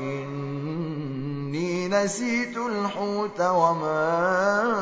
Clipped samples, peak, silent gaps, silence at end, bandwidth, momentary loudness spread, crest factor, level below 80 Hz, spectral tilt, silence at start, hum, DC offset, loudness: under 0.1%; -8 dBFS; none; 0 s; 8 kHz; 9 LU; 18 dB; -68 dBFS; -5.5 dB/octave; 0 s; none; under 0.1%; -25 LUFS